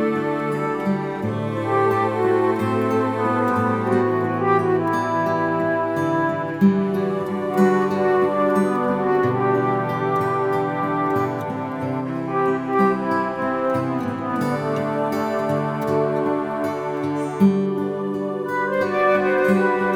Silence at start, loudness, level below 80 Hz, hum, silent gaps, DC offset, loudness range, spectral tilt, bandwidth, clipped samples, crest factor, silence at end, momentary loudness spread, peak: 0 s; -21 LUFS; -60 dBFS; none; none; under 0.1%; 3 LU; -8 dB/octave; 16 kHz; under 0.1%; 16 dB; 0 s; 6 LU; -4 dBFS